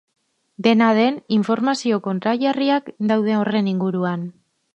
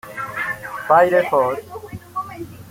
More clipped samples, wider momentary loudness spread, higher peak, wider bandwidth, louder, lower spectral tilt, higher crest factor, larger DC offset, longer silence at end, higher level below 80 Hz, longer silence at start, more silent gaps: neither; second, 6 LU vs 20 LU; about the same, -2 dBFS vs -2 dBFS; second, 8.8 kHz vs 16.5 kHz; about the same, -19 LUFS vs -19 LUFS; about the same, -6.5 dB/octave vs -5.5 dB/octave; about the same, 16 dB vs 18 dB; neither; first, 0.45 s vs 0 s; second, -68 dBFS vs -56 dBFS; first, 0.6 s vs 0.05 s; neither